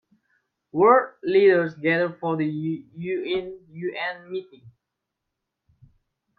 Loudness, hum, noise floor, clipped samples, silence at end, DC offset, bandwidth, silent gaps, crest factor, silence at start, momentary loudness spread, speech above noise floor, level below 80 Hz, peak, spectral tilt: -23 LUFS; none; -83 dBFS; under 0.1%; 1.7 s; under 0.1%; 4.8 kHz; none; 20 dB; 0.75 s; 16 LU; 60 dB; -68 dBFS; -4 dBFS; -9 dB/octave